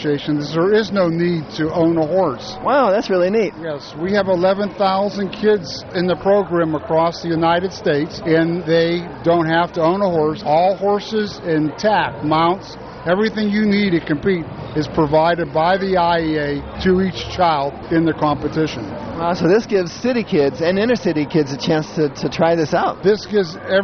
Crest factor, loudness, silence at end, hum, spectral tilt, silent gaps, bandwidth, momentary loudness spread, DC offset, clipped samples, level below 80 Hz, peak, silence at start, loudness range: 14 dB; -18 LUFS; 0 s; none; -6.5 dB/octave; none; 6.6 kHz; 6 LU; under 0.1%; under 0.1%; -44 dBFS; -4 dBFS; 0 s; 1 LU